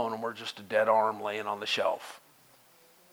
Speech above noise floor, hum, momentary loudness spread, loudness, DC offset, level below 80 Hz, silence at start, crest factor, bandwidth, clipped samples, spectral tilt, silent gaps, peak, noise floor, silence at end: 30 dB; none; 13 LU; -30 LUFS; under 0.1%; -86 dBFS; 0 s; 20 dB; over 20 kHz; under 0.1%; -3 dB/octave; none; -10 dBFS; -60 dBFS; 0.95 s